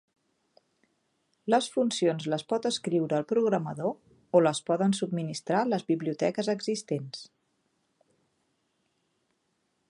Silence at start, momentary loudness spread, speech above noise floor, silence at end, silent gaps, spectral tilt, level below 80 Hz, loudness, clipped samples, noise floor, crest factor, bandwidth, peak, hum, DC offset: 1.45 s; 9 LU; 48 dB; 2.65 s; none; -5.5 dB/octave; -78 dBFS; -28 LUFS; under 0.1%; -76 dBFS; 22 dB; 11.5 kHz; -8 dBFS; none; under 0.1%